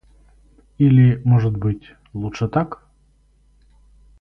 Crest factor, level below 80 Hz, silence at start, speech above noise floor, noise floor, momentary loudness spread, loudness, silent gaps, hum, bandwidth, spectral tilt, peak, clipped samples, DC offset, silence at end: 16 dB; -44 dBFS; 0.8 s; 40 dB; -57 dBFS; 17 LU; -18 LUFS; none; none; 6.2 kHz; -9.5 dB/octave; -4 dBFS; under 0.1%; under 0.1%; 1.45 s